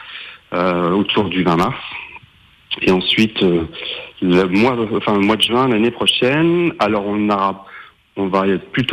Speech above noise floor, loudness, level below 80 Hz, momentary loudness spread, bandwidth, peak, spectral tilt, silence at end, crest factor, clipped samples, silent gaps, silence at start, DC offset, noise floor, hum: 33 dB; -16 LUFS; -50 dBFS; 13 LU; 16 kHz; -4 dBFS; -5.5 dB/octave; 0 s; 12 dB; under 0.1%; none; 0 s; under 0.1%; -49 dBFS; none